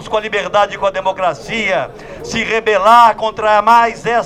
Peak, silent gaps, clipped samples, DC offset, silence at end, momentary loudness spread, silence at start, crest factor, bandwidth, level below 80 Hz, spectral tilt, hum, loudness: 0 dBFS; none; under 0.1%; under 0.1%; 0 s; 11 LU; 0 s; 14 dB; 16.5 kHz; -44 dBFS; -3.5 dB/octave; none; -13 LUFS